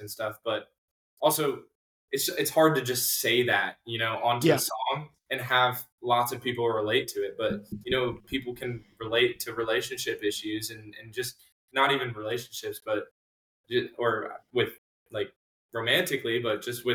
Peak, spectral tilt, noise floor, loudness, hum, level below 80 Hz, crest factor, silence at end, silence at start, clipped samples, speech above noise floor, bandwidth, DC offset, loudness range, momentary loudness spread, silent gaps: -8 dBFS; -3.5 dB/octave; under -90 dBFS; -28 LUFS; none; -64 dBFS; 20 dB; 0 s; 0 s; under 0.1%; over 62 dB; 19 kHz; under 0.1%; 6 LU; 12 LU; 0.78-1.17 s, 1.75-2.08 s, 5.92-5.98 s, 11.52-11.68 s, 13.11-13.64 s, 14.78-15.06 s, 15.36-15.69 s